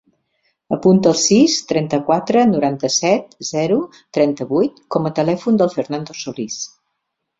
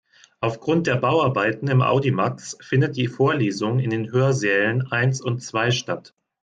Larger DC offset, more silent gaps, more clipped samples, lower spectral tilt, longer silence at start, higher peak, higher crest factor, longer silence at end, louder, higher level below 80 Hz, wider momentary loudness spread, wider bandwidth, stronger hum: neither; neither; neither; second, -4.5 dB/octave vs -6 dB/octave; first, 0.7 s vs 0.4 s; first, -2 dBFS vs -6 dBFS; about the same, 16 dB vs 14 dB; first, 0.75 s vs 0.45 s; first, -17 LUFS vs -21 LUFS; about the same, -58 dBFS vs -60 dBFS; first, 12 LU vs 7 LU; second, 7.8 kHz vs 9 kHz; neither